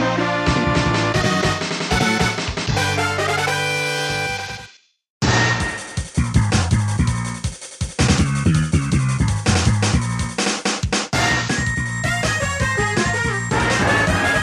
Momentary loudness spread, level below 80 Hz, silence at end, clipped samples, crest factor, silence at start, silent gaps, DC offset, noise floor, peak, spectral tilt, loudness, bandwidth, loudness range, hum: 6 LU; -32 dBFS; 0 s; under 0.1%; 16 dB; 0 s; 5.10-5.20 s; under 0.1%; -45 dBFS; -2 dBFS; -4.5 dB/octave; -19 LUFS; 15 kHz; 2 LU; none